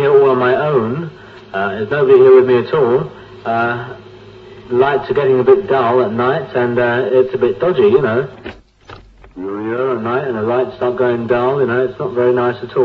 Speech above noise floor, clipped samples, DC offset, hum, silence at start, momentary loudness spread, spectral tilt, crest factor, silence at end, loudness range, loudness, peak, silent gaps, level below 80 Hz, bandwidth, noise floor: 25 dB; under 0.1%; under 0.1%; none; 0 s; 14 LU; -8.5 dB/octave; 14 dB; 0 s; 4 LU; -14 LUFS; 0 dBFS; none; -50 dBFS; 5 kHz; -39 dBFS